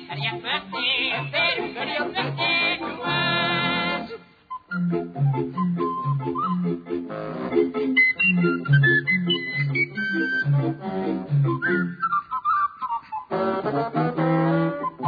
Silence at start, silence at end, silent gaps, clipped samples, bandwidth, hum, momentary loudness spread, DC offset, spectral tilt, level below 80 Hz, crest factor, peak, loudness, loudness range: 0 s; 0 s; none; under 0.1%; 5 kHz; none; 10 LU; under 0.1%; -8.5 dB/octave; -62 dBFS; 16 dB; -8 dBFS; -23 LUFS; 5 LU